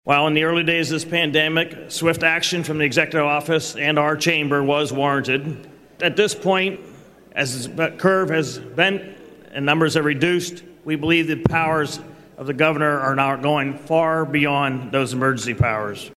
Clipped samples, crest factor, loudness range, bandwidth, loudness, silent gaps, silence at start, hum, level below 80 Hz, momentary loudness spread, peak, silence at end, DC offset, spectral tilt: under 0.1%; 20 dB; 3 LU; 15 kHz; -19 LUFS; none; 0.05 s; none; -50 dBFS; 8 LU; -2 dBFS; 0.05 s; under 0.1%; -4.5 dB/octave